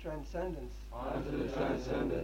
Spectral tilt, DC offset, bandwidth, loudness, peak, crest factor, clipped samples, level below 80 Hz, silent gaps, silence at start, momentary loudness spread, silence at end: -7 dB/octave; under 0.1%; 16 kHz; -38 LUFS; -22 dBFS; 16 dB; under 0.1%; -46 dBFS; none; 0 s; 9 LU; 0 s